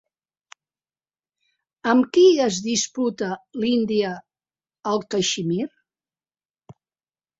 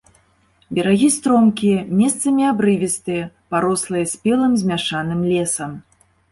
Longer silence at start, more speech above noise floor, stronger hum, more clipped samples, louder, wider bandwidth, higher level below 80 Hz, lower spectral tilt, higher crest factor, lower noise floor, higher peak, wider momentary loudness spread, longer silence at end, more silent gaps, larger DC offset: first, 1.85 s vs 0.7 s; first, over 70 dB vs 41 dB; neither; neither; second, -21 LUFS vs -18 LUFS; second, 8 kHz vs 12 kHz; second, -66 dBFS vs -54 dBFS; about the same, -4 dB/octave vs -5 dB/octave; first, 20 dB vs 14 dB; first, under -90 dBFS vs -58 dBFS; about the same, -4 dBFS vs -4 dBFS; first, 14 LU vs 9 LU; first, 0.65 s vs 0.5 s; neither; neither